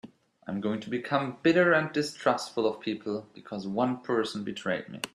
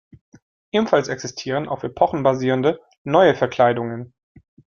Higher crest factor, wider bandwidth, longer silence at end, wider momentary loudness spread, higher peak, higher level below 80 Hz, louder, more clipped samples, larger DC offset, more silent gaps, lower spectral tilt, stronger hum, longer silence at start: about the same, 20 dB vs 18 dB; first, 14 kHz vs 7.2 kHz; second, 0.1 s vs 0.7 s; about the same, 13 LU vs 12 LU; second, -10 dBFS vs -2 dBFS; second, -72 dBFS vs -58 dBFS; second, -29 LUFS vs -20 LUFS; neither; neither; second, none vs 2.98-3.05 s; about the same, -5.5 dB/octave vs -6 dB/octave; neither; second, 0.05 s vs 0.75 s